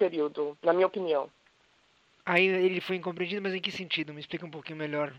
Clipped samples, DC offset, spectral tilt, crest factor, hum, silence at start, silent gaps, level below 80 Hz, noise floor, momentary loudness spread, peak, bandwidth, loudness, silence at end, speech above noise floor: under 0.1%; under 0.1%; -6 dB/octave; 20 dB; none; 0 s; none; -78 dBFS; -66 dBFS; 14 LU; -10 dBFS; 8 kHz; -29 LUFS; 0 s; 36 dB